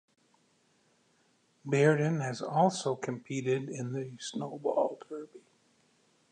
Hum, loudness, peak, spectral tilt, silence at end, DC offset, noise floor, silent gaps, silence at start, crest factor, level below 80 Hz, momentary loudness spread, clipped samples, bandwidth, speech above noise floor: none; -31 LUFS; -12 dBFS; -6 dB/octave; 0.95 s; under 0.1%; -70 dBFS; none; 1.65 s; 22 dB; -82 dBFS; 17 LU; under 0.1%; 9.8 kHz; 40 dB